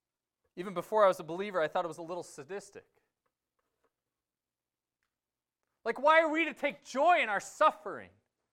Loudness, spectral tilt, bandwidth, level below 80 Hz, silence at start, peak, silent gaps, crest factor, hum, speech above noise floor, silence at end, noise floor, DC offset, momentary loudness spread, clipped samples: -30 LUFS; -4 dB/octave; 15 kHz; -78 dBFS; 0.55 s; -12 dBFS; none; 22 dB; none; over 59 dB; 0.45 s; under -90 dBFS; under 0.1%; 18 LU; under 0.1%